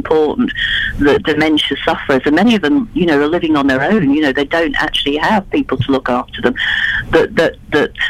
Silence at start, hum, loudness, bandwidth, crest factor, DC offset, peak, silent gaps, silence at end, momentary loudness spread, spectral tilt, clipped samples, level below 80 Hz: 0 s; none; -14 LUFS; 13.5 kHz; 14 dB; under 0.1%; 0 dBFS; none; 0 s; 4 LU; -5.5 dB/octave; under 0.1%; -34 dBFS